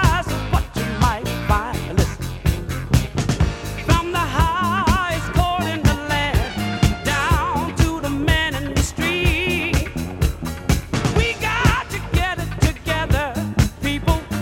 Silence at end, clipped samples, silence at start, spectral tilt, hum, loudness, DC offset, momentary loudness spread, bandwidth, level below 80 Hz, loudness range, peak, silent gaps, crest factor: 0 s; under 0.1%; 0 s; -5 dB/octave; none; -20 LUFS; under 0.1%; 5 LU; 17 kHz; -26 dBFS; 2 LU; 0 dBFS; none; 18 dB